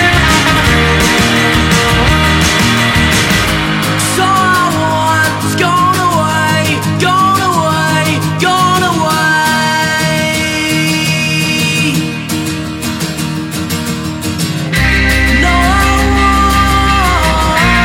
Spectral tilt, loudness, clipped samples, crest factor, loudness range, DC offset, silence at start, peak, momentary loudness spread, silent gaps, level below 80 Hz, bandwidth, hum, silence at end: -4 dB/octave; -10 LUFS; under 0.1%; 10 dB; 4 LU; under 0.1%; 0 s; 0 dBFS; 7 LU; none; -22 dBFS; 17 kHz; none; 0 s